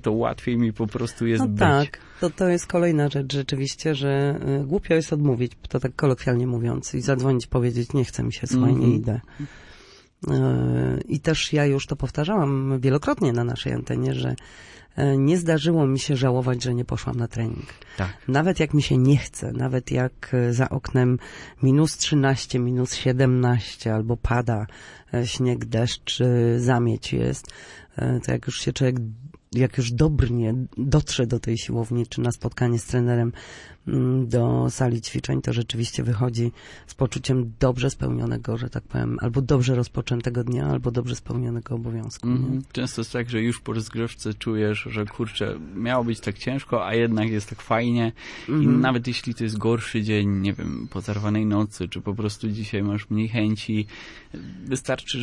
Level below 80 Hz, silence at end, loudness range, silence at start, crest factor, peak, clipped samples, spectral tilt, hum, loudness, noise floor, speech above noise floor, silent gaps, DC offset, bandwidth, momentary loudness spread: -44 dBFS; 0 s; 4 LU; 0.05 s; 18 dB; -6 dBFS; under 0.1%; -6.5 dB/octave; none; -24 LUFS; -49 dBFS; 26 dB; none; under 0.1%; 11.5 kHz; 9 LU